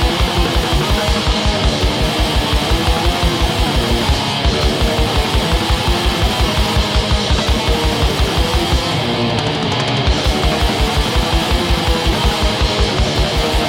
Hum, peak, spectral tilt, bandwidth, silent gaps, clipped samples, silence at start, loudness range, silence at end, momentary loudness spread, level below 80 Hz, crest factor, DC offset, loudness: none; 0 dBFS; -4.5 dB/octave; 16.5 kHz; none; under 0.1%; 0 s; 0 LU; 0 s; 1 LU; -18 dBFS; 14 dB; under 0.1%; -15 LUFS